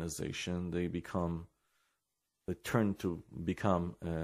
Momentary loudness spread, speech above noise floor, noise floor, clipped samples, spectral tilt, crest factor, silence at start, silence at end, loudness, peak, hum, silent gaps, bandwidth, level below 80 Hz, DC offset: 9 LU; 50 dB; -85 dBFS; under 0.1%; -6 dB/octave; 22 dB; 0 s; 0 s; -37 LUFS; -16 dBFS; none; none; 15 kHz; -56 dBFS; under 0.1%